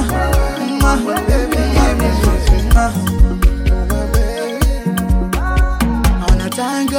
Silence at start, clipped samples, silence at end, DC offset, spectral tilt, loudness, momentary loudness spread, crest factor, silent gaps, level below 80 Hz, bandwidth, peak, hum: 0 s; under 0.1%; 0 s; under 0.1%; -5.5 dB/octave; -16 LUFS; 4 LU; 12 dB; none; -16 dBFS; 17 kHz; 0 dBFS; none